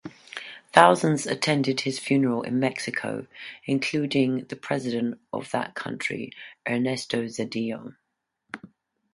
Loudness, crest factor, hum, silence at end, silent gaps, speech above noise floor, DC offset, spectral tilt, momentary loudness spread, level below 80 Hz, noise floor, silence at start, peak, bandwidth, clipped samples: -25 LUFS; 26 dB; none; 0.5 s; none; 51 dB; under 0.1%; -5 dB/octave; 17 LU; -70 dBFS; -76 dBFS; 0.05 s; 0 dBFS; 11.5 kHz; under 0.1%